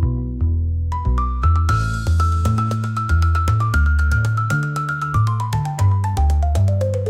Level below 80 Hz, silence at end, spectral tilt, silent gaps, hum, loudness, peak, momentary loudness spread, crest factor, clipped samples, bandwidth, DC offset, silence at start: -24 dBFS; 0 s; -7 dB/octave; none; none; -19 LUFS; -6 dBFS; 5 LU; 12 dB; under 0.1%; 12 kHz; under 0.1%; 0 s